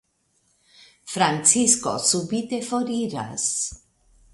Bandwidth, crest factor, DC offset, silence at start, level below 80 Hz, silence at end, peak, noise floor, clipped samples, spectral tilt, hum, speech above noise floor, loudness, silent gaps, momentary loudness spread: 11.5 kHz; 24 dB; under 0.1%; 1.05 s; -58 dBFS; 0.55 s; -2 dBFS; -68 dBFS; under 0.1%; -2.5 dB/octave; none; 45 dB; -21 LUFS; none; 11 LU